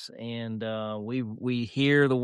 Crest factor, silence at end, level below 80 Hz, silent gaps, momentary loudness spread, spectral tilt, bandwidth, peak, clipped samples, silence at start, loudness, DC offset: 18 dB; 0 s; -70 dBFS; none; 12 LU; -7 dB/octave; 11 kHz; -10 dBFS; under 0.1%; 0 s; -29 LUFS; under 0.1%